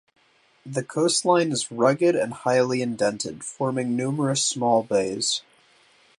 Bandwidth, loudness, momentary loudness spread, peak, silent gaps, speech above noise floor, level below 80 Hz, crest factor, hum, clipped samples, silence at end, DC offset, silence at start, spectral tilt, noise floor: 11.5 kHz; -23 LUFS; 9 LU; -6 dBFS; none; 36 dB; -68 dBFS; 18 dB; none; under 0.1%; 0.8 s; under 0.1%; 0.65 s; -4 dB/octave; -59 dBFS